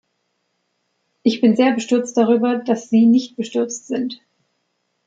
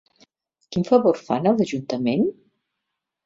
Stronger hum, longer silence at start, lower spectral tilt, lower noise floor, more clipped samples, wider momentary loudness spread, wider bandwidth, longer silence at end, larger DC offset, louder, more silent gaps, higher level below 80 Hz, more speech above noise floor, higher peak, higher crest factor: neither; first, 1.25 s vs 0.7 s; second, -5 dB/octave vs -7 dB/octave; second, -71 dBFS vs -81 dBFS; neither; about the same, 10 LU vs 8 LU; about the same, 7.8 kHz vs 7.8 kHz; about the same, 0.9 s vs 0.95 s; neither; first, -18 LUFS vs -22 LUFS; neither; second, -70 dBFS vs -62 dBFS; second, 54 dB vs 61 dB; about the same, -4 dBFS vs -4 dBFS; about the same, 16 dB vs 20 dB